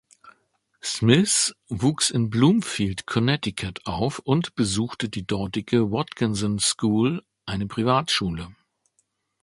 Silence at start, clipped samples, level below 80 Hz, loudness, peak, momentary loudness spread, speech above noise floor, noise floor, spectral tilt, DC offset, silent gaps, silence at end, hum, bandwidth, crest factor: 0.25 s; under 0.1%; -50 dBFS; -23 LUFS; -2 dBFS; 11 LU; 48 dB; -71 dBFS; -4.5 dB/octave; under 0.1%; none; 0.9 s; none; 11.5 kHz; 22 dB